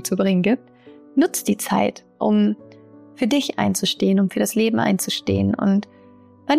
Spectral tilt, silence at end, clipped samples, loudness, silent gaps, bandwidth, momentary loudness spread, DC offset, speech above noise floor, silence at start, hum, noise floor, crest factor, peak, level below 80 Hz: -5 dB/octave; 0 s; under 0.1%; -20 LUFS; none; 15.5 kHz; 6 LU; under 0.1%; 29 dB; 0 s; none; -48 dBFS; 12 dB; -8 dBFS; -60 dBFS